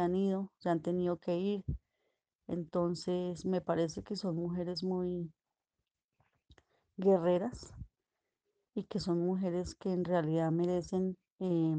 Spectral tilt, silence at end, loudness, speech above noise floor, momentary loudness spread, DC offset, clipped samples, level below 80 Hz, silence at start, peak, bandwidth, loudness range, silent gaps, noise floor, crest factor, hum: -7.5 dB/octave; 0 s; -35 LUFS; 56 dB; 12 LU; under 0.1%; under 0.1%; -60 dBFS; 0 s; -18 dBFS; 9.2 kHz; 3 LU; 2.35-2.39 s, 6.04-6.09 s, 11.32-11.36 s; -90 dBFS; 18 dB; none